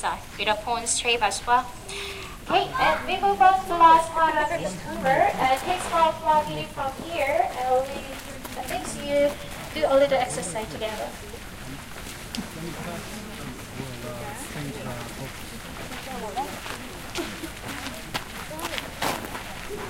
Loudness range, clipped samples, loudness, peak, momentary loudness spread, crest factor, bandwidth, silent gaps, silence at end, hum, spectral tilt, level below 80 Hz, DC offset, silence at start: 14 LU; under 0.1%; -25 LUFS; -6 dBFS; 16 LU; 20 dB; 16.5 kHz; none; 0 s; none; -3 dB/octave; -46 dBFS; under 0.1%; 0 s